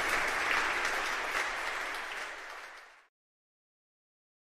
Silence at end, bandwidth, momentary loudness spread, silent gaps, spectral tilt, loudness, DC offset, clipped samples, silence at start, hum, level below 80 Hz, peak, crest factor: 1.55 s; 15 kHz; 16 LU; none; -0.5 dB/octave; -32 LUFS; under 0.1%; under 0.1%; 0 s; none; -58 dBFS; -14 dBFS; 22 dB